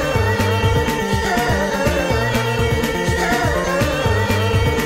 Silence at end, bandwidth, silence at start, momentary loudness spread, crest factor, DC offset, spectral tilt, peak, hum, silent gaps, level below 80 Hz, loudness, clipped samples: 0 s; 16 kHz; 0 s; 1 LU; 10 dB; under 0.1%; -5 dB/octave; -6 dBFS; none; none; -28 dBFS; -18 LUFS; under 0.1%